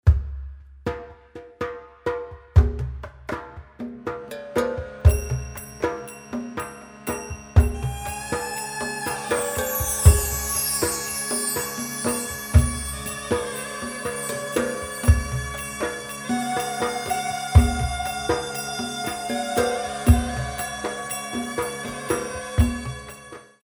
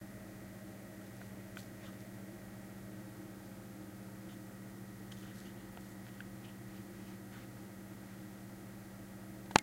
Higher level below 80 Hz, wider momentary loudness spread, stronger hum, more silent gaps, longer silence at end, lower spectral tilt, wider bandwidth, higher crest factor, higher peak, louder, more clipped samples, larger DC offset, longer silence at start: first, -28 dBFS vs -66 dBFS; first, 13 LU vs 1 LU; neither; neither; first, 0.2 s vs 0 s; about the same, -4.5 dB/octave vs -4 dB/octave; first, 20 kHz vs 16 kHz; second, 24 dB vs 42 dB; about the same, 0 dBFS vs -2 dBFS; first, -25 LUFS vs -48 LUFS; neither; neither; about the same, 0.05 s vs 0 s